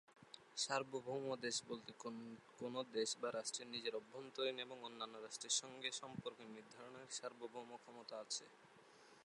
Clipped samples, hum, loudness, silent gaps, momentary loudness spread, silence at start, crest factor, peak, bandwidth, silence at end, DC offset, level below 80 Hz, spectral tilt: under 0.1%; none; -46 LUFS; none; 16 LU; 0.1 s; 22 dB; -26 dBFS; 11.5 kHz; 0 s; under 0.1%; under -90 dBFS; -2 dB/octave